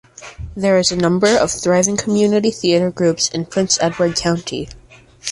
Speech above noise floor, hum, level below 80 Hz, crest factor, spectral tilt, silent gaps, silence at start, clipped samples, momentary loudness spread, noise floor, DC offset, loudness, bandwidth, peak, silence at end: 25 dB; none; -44 dBFS; 16 dB; -4 dB/octave; none; 0.2 s; under 0.1%; 13 LU; -41 dBFS; under 0.1%; -16 LUFS; 11.5 kHz; -2 dBFS; 0 s